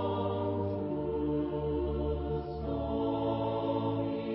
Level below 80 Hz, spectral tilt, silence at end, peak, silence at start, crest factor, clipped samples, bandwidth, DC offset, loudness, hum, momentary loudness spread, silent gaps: -44 dBFS; -7.5 dB/octave; 0 s; -20 dBFS; 0 s; 14 dB; under 0.1%; 5.6 kHz; under 0.1%; -33 LUFS; none; 3 LU; none